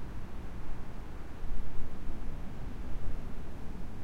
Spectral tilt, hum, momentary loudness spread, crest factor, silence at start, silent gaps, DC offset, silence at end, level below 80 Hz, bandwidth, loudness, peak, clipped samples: -7 dB/octave; none; 3 LU; 12 dB; 0 s; none; under 0.1%; 0 s; -40 dBFS; 4.5 kHz; -45 LUFS; -16 dBFS; under 0.1%